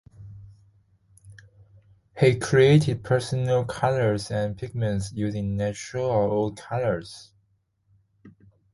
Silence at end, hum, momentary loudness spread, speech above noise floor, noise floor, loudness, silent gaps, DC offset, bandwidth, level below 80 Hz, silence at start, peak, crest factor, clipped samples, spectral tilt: 0.45 s; none; 11 LU; 46 dB; -69 dBFS; -24 LUFS; none; under 0.1%; 11.5 kHz; -52 dBFS; 0.2 s; -6 dBFS; 20 dB; under 0.1%; -6.5 dB/octave